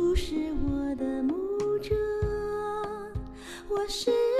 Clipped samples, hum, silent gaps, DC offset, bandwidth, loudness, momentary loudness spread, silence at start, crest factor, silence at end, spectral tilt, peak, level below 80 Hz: under 0.1%; none; none; under 0.1%; 13.5 kHz; -30 LUFS; 10 LU; 0 s; 16 dB; 0 s; -6 dB/octave; -14 dBFS; -40 dBFS